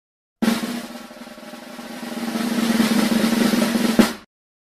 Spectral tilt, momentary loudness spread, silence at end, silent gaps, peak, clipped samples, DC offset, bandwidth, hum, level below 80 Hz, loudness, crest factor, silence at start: -4.5 dB/octave; 19 LU; 0.5 s; none; 0 dBFS; under 0.1%; under 0.1%; 15.5 kHz; none; -52 dBFS; -20 LUFS; 20 dB; 0.4 s